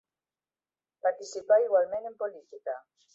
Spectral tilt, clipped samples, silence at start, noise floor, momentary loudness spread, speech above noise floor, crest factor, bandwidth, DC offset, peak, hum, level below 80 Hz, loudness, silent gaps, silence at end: -2.5 dB/octave; under 0.1%; 1.05 s; under -90 dBFS; 15 LU; over 61 dB; 18 dB; 7.8 kHz; under 0.1%; -12 dBFS; none; -80 dBFS; -29 LUFS; none; 0.35 s